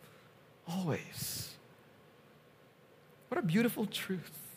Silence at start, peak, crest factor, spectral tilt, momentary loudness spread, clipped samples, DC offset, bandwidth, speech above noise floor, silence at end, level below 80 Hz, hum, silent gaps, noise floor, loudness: 0 s; -18 dBFS; 20 dB; -5 dB/octave; 18 LU; under 0.1%; under 0.1%; 15.5 kHz; 27 dB; 0 s; -74 dBFS; none; none; -62 dBFS; -36 LUFS